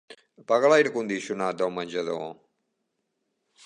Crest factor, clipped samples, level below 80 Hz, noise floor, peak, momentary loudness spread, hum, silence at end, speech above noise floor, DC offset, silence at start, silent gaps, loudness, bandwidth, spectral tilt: 20 dB; under 0.1%; -76 dBFS; -78 dBFS; -8 dBFS; 14 LU; none; 1.3 s; 54 dB; under 0.1%; 0.1 s; none; -25 LUFS; 10 kHz; -4.5 dB/octave